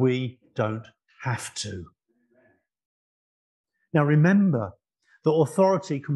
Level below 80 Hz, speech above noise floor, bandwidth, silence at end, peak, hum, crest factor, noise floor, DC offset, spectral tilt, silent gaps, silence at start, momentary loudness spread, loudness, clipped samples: -60 dBFS; 42 dB; 12 kHz; 0 s; -6 dBFS; none; 18 dB; -65 dBFS; under 0.1%; -7 dB/octave; 2.85-3.64 s; 0 s; 15 LU; -24 LUFS; under 0.1%